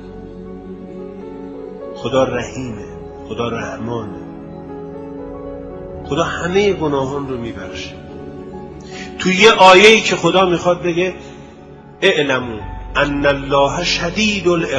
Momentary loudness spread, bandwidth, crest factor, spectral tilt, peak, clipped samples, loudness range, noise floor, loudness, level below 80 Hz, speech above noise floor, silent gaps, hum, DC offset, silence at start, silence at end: 22 LU; 11 kHz; 18 dB; -4 dB/octave; 0 dBFS; 0.1%; 13 LU; -38 dBFS; -14 LUFS; -40 dBFS; 23 dB; none; none; under 0.1%; 0 s; 0 s